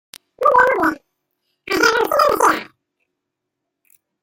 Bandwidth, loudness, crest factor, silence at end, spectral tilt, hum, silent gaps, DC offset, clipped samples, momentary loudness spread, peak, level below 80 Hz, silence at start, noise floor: 17 kHz; -16 LUFS; 18 dB; 1.6 s; -2.5 dB/octave; none; none; under 0.1%; under 0.1%; 10 LU; -2 dBFS; -54 dBFS; 0.4 s; -79 dBFS